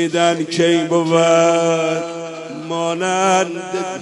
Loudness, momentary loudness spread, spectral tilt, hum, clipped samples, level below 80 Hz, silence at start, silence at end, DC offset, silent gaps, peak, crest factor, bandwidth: -16 LUFS; 12 LU; -4.5 dB/octave; none; under 0.1%; -68 dBFS; 0 s; 0 s; under 0.1%; none; -2 dBFS; 16 dB; 11 kHz